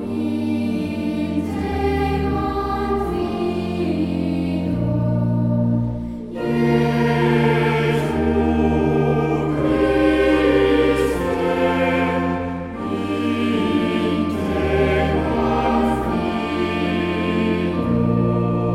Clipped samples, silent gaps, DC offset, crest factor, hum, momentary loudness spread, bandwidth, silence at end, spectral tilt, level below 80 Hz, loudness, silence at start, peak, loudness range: under 0.1%; none; under 0.1%; 14 dB; none; 6 LU; 14 kHz; 0 s; -7.5 dB/octave; -34 dBFS; -20 LUFS; 0 s; -4 dBFS; 4 LU